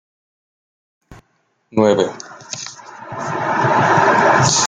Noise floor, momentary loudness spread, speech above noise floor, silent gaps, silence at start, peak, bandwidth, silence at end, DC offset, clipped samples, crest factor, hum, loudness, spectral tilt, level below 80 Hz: -64 dBFS; 19 LU; 47 dB; none; 1.1 s; -2 dBFS; 10 kHz; 0 s; under 0.1%; under 0.1%; 16 dB; none; -15 LUFS; -3.5 dB/octave; -56 dBFS